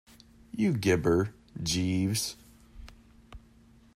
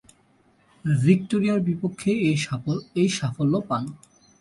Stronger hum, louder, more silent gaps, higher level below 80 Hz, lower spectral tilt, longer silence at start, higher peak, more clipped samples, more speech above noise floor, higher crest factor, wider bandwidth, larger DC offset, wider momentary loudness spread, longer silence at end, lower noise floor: neither; second, -29 LUFS vs -24 LUFS; neither; first, -54 dBFS vs -60 dBFS; second, -5 dB/octave vs -6.5 dB/octave; second, 0.55 s vs 0.85 s; second, -12 dBFS vs -6 dBFS; neither; second, 31 dB vs 38 dB; about the same, 18 dB vs 18 dB; first, 15.5 kHz vs 11.5 kHz; neither; about the same, 11 LU vs 9 LU; about the same, 0.55 s vs 0.45 s; about the same, -58 dBFS vs -61 dBFS